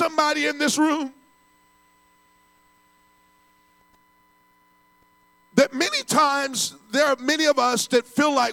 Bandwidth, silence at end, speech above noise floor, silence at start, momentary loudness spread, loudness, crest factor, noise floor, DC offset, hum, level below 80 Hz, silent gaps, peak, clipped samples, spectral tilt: 17.5 kHz; 0 s; 39 dB; 0 s; 5 LU; -21 LUFS; 20 dB; -60 dBFS; under 0.1%; none; -72 dBFS; none; -6 dBFS; under 0.1%; -2.5 dB/octave